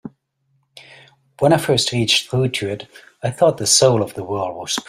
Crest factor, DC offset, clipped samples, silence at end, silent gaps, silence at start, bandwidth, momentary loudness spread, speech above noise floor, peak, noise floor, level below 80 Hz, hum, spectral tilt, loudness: 18 dB; under 0.1%; under 0.1%; 0.05 s; none; 0.05 s; 16 kHz; 13 LU; 48 dB; 0 dBFS; -66 dBFS; -56 dBFS; none; -3.5 dB/octave; -17 LUFS